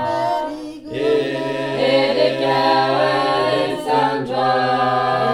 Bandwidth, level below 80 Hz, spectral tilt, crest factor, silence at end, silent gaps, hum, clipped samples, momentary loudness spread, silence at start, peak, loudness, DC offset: 13.5 kHz; -56 dBFS; -5.5 dB/octave; 14 dB; 0 s; none; none; under 0.1%; 7 LU; 0 s; -2 dBFS; -18 LUFS; under 0.1%